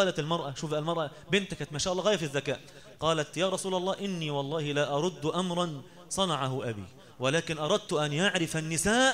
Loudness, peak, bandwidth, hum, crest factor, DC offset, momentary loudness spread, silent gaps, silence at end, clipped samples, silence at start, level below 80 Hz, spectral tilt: -30 LUFS; -12 dBFS; 16 kHz; none; 18 dB; 0.1%; 8 LU; none; 0 s; under 0.1%; 0 s; -58 dBFS; -4 dB/octave